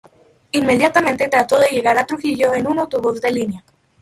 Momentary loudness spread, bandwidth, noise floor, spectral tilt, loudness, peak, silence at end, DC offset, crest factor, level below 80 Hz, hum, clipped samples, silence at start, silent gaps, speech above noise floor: 8 LU; 15.5 kHz; -43 dBFS; -4.5 dB/octave; -17 LUFS; -2 dBFS; 0.4 s; under 0.1%; 16 dB; -56 dBFS; none; under 0.1%; 0.55 s; none; 27 dB